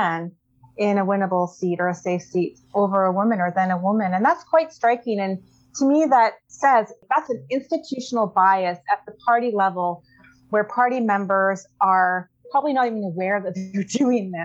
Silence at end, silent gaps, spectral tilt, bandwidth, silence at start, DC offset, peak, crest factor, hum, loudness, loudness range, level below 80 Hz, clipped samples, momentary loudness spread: 0 s; none; -6 dB/octave; 8.2 kHz; 0 s; under 0.1%; -6 dBFS; 16 dB; none; -21 LUFS; 2 LU; -72 dBFS; under 0.1%; 8 LU